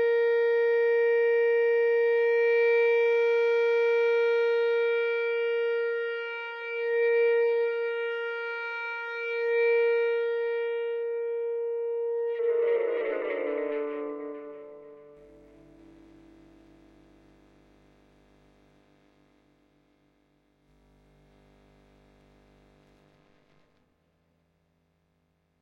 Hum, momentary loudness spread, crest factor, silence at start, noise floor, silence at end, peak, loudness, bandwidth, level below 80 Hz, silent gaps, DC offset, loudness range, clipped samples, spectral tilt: 50 Hz at -70 dBFS; 9 LU; 12 dB; 0 s; -72 dBFS; 10.55 s; -18 dBFS; -26 LUFS; 6 kHz; -72 dBFS; none; under 0.1%; 11 LU; under 0.1%; -4 dB/octave